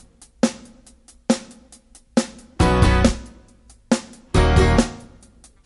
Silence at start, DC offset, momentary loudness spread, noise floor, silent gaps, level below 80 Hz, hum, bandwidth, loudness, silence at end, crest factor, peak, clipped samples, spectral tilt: 0.45 s; under 0.1%; 17 LU; -50 dBFS; none; -26 dBFS; none; 11.5 kHz; -20 LUFS; 0.65 s; 20 dB; -2 dBFS; under 0.1%; -5.5 dB/octave